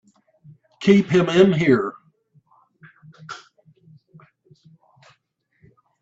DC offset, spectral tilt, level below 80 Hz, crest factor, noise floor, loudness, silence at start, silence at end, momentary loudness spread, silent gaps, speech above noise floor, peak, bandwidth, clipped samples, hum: under 0.1%; -7 dB/octave; -62 dBFS; 22 dB; -68 dBFS; -18 LUFS; 0.8 s; 2.65 s; 23 LU; none; 52 dB; -2 dBFS; 8 kHz; under 0.1%; none